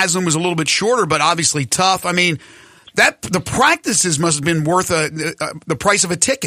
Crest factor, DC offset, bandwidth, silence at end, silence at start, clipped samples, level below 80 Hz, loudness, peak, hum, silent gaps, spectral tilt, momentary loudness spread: 16 dB; under 0.1%; 15.5 kHz; 0 s; 0 s; under 0.1%; -50 dBFS; -16 LUFS; 0 dBFS; none; none; -3 dB/octave; 8 LU